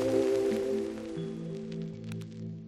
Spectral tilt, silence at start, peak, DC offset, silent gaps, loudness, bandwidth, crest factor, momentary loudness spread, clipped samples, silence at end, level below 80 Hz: -7 dB/octave; 0 s; -16 dBFS; under 0.1%; none; -33 LUFS; 13.5 kHz; 16 dB; 13 LU; under 0.1%; 0 s; -62 dBFS